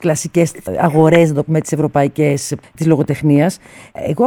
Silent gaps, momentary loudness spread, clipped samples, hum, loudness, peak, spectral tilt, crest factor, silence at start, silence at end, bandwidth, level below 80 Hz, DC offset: none; 12 LU; under 0.1%; none; -15 LUFS; 0 dBFS; -6.5 dB/octave; 14 dB; 0 s; 0 s; 16.5 kHz; -48 dBFS; under 0.1%